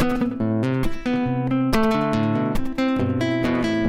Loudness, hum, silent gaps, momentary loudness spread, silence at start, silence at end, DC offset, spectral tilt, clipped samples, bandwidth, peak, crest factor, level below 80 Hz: -22 LUFS; none; none; 4 LU; 0 s; 0 s; under 0.1%; -7 dB/octave; under 0.1%; 15.5 kHz; -6 dBFS; 14 dB; -36 dBFS